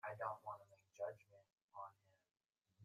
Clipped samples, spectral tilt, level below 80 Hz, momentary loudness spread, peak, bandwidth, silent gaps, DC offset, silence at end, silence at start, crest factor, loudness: under 0.1%; -5.5 dB/octave; under -90 dBFS; 15 LU; -32 dBFS; 15 kHz; 1.62-1.68 s; under 0.1%; 0 s; 0.05 s; 22 dB; -52 LUFS